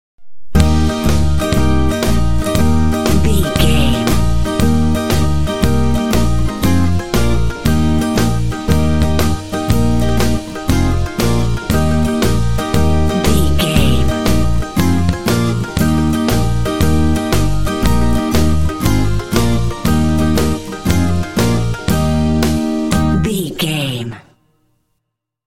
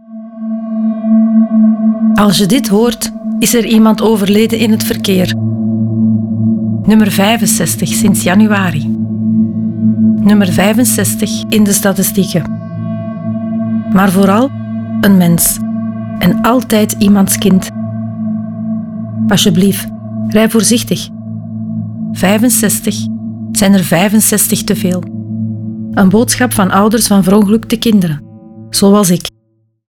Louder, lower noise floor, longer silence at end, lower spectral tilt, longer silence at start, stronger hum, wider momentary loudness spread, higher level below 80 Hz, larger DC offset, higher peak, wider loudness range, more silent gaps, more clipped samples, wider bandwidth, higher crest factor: second, -15 LUFS vs -11 LUFS; first, -74 dBFS vs -57 dBFS; second, 0 s vs 0.7 s; about the same, -6 dB/octave vs -5 dB/octave; about the same, 0.15 s vs 0.1 s; neither; second, 3 LU vs 11 LU; first, -22 dBFS vs -40 dBFS; first, 9% vs under 0.1%; about the same, 0 dBFS vs 0 dBFS; about the same, 1 LU vs 3 LU; neither; neither; second, 17 kHz vs 19.5 kHz; about the same, 14 dB vs 10 dB